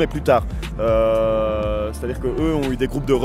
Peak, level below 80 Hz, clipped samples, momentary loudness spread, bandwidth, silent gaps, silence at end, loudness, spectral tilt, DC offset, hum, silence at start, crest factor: -4 dBFS; -30 dBFS; under 0.1%; 7 LU; 15 kHz; none; 0 s; -20 LUFS; -7 dB/octave; under 0.1%; none; 0 s; 16 dB